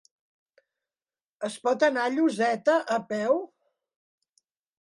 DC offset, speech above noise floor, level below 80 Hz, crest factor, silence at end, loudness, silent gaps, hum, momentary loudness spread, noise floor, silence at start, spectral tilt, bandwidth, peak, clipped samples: under 0.1%; over 65 dB; -80 dBFS; 18 dB; 1.4 s; -26 LUFS; none; none; 10 LU; under -90 dBFS; 1.4 s; -4.5 dB/octave; 11.5 kHz; -12 dBFS; under 0.1%